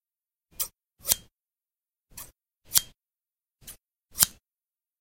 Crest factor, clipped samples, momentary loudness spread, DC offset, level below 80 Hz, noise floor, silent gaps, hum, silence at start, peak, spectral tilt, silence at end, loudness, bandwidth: 34 dB; under 0.1%; 23 LU; under 0.1%; -58 dBFS; under -90 dBFS; none; none; 0.6 s; 0 dBFS; 1 dB/octave; 0.7 s; -26 LUFS; 17 kHz